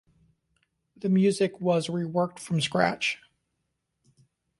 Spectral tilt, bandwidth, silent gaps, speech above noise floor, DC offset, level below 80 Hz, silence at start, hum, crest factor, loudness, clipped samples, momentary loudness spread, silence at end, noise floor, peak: -5.5 dB/octave; 11.5 kHz; none; 54 dB; under 0.1%; -68 dBFS; 1.05 s; none; 20 dB; -26 LUFS; under 0.1%; 6 LU; 1.45 s; -79 dBFS; -8 dBFS